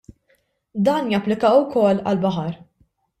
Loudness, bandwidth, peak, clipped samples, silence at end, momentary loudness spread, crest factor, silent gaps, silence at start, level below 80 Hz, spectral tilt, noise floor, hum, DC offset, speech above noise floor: -19 LUFS; 13 kHz; -4 dBFS; under 0.1%; 0.65 s; 14 LU; 16 dB; none; 0.75 s; -60 dBFS; -7.5 dB/octave; -64 dBFS; none; under 0.1%; 46 dB